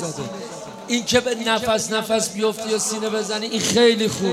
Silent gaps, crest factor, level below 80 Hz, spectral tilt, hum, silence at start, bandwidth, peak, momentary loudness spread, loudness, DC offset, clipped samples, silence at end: none; 20 dB; -58 dBFS; -3 dB/octave; none; 0 s; 16 kHz; -2 dBFS; 14 LU; -20 LUFS; under 0.1%; under 0.1%; 0 s